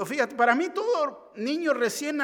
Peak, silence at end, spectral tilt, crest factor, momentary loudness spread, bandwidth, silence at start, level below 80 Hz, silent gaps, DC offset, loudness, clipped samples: -6 dBFS; 0 s; -3.5 dB/octave; 20 dB; 8 LU; 18 kHz; 0 s; -80 dBFS; none; under 0.1%; -26 LUFS; under 0.1%